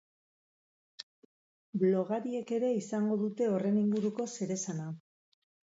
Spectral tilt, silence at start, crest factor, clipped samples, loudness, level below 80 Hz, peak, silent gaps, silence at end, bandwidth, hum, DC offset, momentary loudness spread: -6.5 dB/octave; 1 s; 16 dB; under 0.1%; -32 LUFS; -82 dBFS; -18 dBFS; 1.03-1.73 s; 0.7 s; 8 kHz; none; under 0.1%; 19 LU